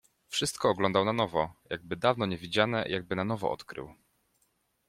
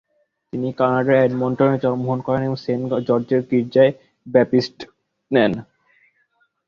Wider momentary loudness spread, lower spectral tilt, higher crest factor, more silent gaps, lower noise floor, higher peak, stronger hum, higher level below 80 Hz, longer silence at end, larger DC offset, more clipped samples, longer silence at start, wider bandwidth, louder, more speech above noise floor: about the same, 12 LU vs 13 LU; second, -4.5 dB/octave vs -8 dB/octave; first, 24 dB vs 18 dB; neither; first, -74 dBFS vs -65 dBFS; second, -8 dBFS vs -2 dBFS; neither; second, -62 dBFS vs -56 dBFS; about the same, 0.95 s vs 1.05 s; neither; neither; second, 0.3 s vs 0.55 s; first, 16 kHz vs 6.8 kHz; second, -30 LUFS vs -19 LUFS; about the same, 44 dB vs 47 dB